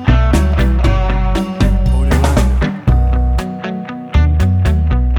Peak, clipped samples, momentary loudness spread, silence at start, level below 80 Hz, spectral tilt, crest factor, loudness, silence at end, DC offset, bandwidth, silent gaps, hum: 0 dBFS; under 0.1%; 6 LU; 0 s; -14 dBFS; -7 dB/octave; 12 dB; -15 LUFS; 0 s; under 0.1%; 12 kHz; none; none